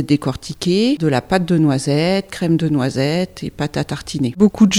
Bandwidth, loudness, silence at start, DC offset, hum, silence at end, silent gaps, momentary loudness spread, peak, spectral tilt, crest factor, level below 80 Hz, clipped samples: 14.5 kHz; -18 LUFS; 0 s; under 0.1%; none; 0 s; none; 8 LU; 0 dBFS; -6 dB/octave; 16 dB; -44 dBFS; under 0.1%